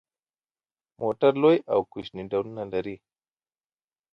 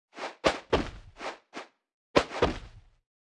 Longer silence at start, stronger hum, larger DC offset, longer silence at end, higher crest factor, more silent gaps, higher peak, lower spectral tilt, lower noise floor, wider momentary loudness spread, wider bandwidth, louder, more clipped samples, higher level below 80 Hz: first, 1 s vs 0.15 s; neither; neither; first, 1.2 s vs 0.55 s; second, 20 dB vs 28 dB; second, none vs 1.94-2.14 s; about the same, -8 dBFS vs -6 dBFS; first, -8.5 dB/octave vs -4.5 dB/octave; first, under -90 dBFS vs -49 dBFS; about the same, 16 LU vs 17 LU; second, 5.8 kHz vs 11.5 kHz; first, -25 LUFS vs -30 LUFS; neither; second, -64 dBFS vs -48 dBFS